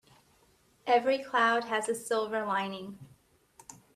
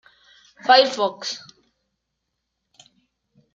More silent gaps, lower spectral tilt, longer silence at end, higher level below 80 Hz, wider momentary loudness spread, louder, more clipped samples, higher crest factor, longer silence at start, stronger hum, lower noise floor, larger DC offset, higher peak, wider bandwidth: neither; first, -3 dB/octave vs -1.5 dB/octave; second, 0.2 s vs 2.15 s; about the same, -76 dBFS vs -78 dBFS; first, 18 LU vs 15 LU; second, -29 LUFS vs -19 LUFS; neither; about the same, 20 dB vs 24 dB; first, 0.85 s vs 0.65 s; neither; second, -66 dBFS vs -78 dBFS; neither; second, -12 dBFS vs -2 dBFS; first, 15 kHz vs 7.8 kHz